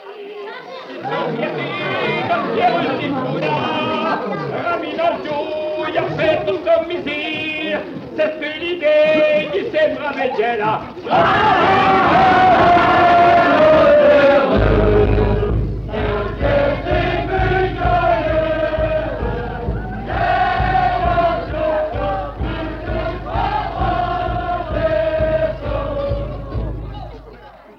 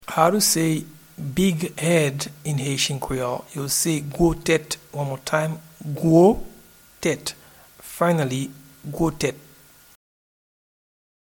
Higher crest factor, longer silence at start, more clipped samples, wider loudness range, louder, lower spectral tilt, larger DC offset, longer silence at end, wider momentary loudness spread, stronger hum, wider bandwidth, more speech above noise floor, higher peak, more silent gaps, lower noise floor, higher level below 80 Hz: second, 16 dB vs 22 dB; about the same, 0 s vs 0.1 s; neither; first, 9 LU vs 6 LU; first, -17 LUFS vs -22 LUFS; first, -7.5 dB/octave vs -4.5 dB/octave; neither; second, 0.05 s vs 1.85 s; about the same, 13 LU vs 15 LU; neither; second, 7.2 kHz vs 19 kHz; second, 23 dB vs 29 dB; about the same, -2 dBFS vs -2 dBFS; neither; second, -40 dBFS vs -51 dBFS; first, -30 dBFS vs -46 dBFS